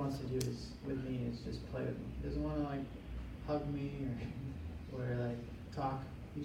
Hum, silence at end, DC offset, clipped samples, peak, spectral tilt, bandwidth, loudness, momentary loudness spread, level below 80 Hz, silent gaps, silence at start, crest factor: none; 0 s; under 0.1%; under 0.1%; -22 dBFS; -7 dB/octave; 16.5 kHz; -42 LUFS; 8 LU; -50 dBFS; none; 0 s; 18 dB